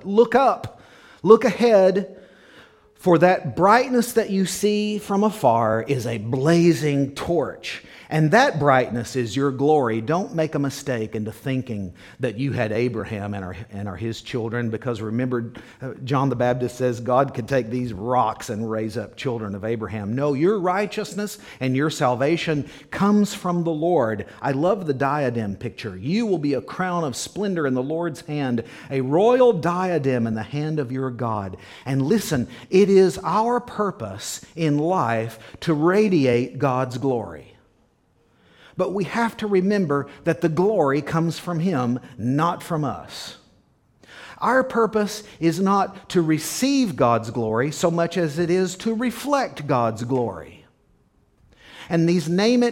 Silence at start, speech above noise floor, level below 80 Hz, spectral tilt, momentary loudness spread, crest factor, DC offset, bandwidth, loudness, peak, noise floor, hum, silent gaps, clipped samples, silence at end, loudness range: 0 s; 41 dB; -56 dBFS; -6 dB/octave; 12 LU; 22 dB; under 0.1%; 17 kHz; -22 LUFS; 0 dBFS; -62 dBFS; none; none; under 0.1%; 0 s; 6 LU